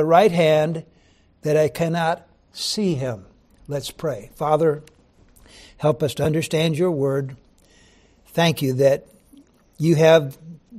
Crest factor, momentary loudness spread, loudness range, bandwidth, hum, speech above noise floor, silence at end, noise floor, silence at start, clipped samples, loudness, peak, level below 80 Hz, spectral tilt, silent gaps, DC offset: 18 dB; 15 LU; 4 LU; 15 kHz; none; 37 dB; 0 s; -56 dBFS; 0 s; under 0.1%; -21 LUFS; -4 dBFS; -54 dBFS; -6 dB/octave; none; under 0.1%